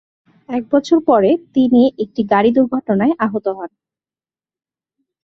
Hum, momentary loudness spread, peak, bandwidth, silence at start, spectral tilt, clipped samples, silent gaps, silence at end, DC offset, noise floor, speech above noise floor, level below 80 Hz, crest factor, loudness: none; 12 LU; 0 dBFS; 7.2 kHz; 0.5 s; -7.5 dB/octave; under 0.1%; none; 1.55 s; under 0.1%; under -90 dBFS; over 75 dB; -58 dBFS; 16 dB; -15 LUFS